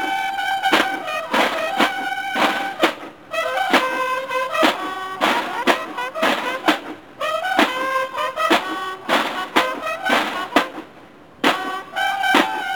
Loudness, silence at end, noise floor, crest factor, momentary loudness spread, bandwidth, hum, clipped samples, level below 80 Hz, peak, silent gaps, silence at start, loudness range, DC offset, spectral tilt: -20 LUFS; 0 s; -44 dBFS; 20 dB; 7 LU; 18 kHz; none; under 0.1%; -60 dBFS; -2 dBFS; none; 0 s; 1 LU; 0.2%; -2.5 dB/octave